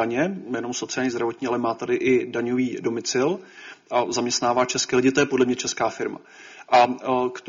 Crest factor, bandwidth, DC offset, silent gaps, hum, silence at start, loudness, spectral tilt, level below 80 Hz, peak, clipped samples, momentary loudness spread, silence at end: 18 dB; 7.6 kHz; under 0.1%; none; none; 0 s; -23 LUFS; -3.5 dB/octave; -62 dBFS; -6 dBFS; under 0.1%; 10 LU; 0 s